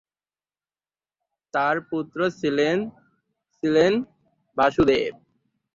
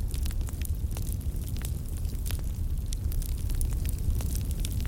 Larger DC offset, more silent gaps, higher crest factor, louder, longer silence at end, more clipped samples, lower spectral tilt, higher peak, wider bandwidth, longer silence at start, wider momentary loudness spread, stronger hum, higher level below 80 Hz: neither; neither; about the same, 18 dB vs 16 dB; first, -23 LUFS vs -33 LUFS; first, 0.65 s vs 0 s; neither; about the same, -6 dB/octave vs -5.5 dB/octave; first, -6 dBFS vs -14 dBFS; second, 7.6 kHz vs 17 kHz; first, 1.55 s vs 0 s; first, 12 LU vs 3 LU; neither; second, -52 dBFS vs -30 dBFS